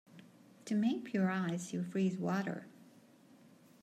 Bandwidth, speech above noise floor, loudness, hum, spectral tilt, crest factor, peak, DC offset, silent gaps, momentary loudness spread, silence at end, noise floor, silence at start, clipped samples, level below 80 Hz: 13.5 kHz; 27 dB; -36 LUFS; none; -6.5 dB/octave; 14 dB; -22 dBFS; under 0.1%; none; 12 LU; 0.95 s; -62 dBFS; 0.15 s; under 0.1%; -84 dBFS